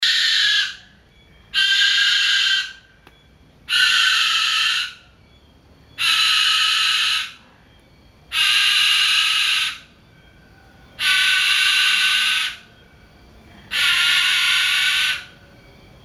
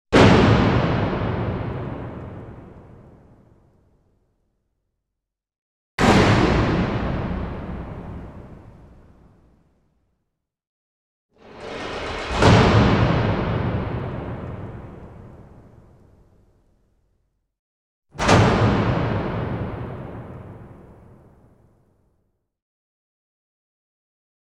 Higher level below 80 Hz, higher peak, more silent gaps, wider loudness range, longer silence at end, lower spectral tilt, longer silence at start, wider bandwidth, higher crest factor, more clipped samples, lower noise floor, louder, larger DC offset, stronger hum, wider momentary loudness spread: second, -56 dBFS vs -36 dBFS; about the same, -4 dBFS vs -2 dBFS; second, none vs 5.58-5.98 s, 10.67-11.29 s, 17.59-18.02 s; second, 2 LU vs 20 LU; second, 0.75 s vs 3.65 s; second, 2.5 dB/octave vs -6.5 dB/octave; about the same, 0 s vs 0.1 s; first, 16 kHz vs 11 kHz; about the same, 18 dB vs 22 dB; neither; second, -51 dBFS vs -83 dBFS; first, -16 LUFS vs -20 LUFS; neither; neither; second, 9 LU vs 24 LU